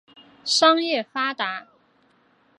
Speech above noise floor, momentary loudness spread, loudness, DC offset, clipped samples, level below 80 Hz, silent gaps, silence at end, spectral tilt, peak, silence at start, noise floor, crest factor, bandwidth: 40 dB; 15 LU; -21 LUFS; under 0.1%; under 0.1%; -78 dBFS; none; 0.95 s; -1 dB/octave; -4 dBFS; 0.45 s; -61 dBFS; 22 dB; 11.5 kHz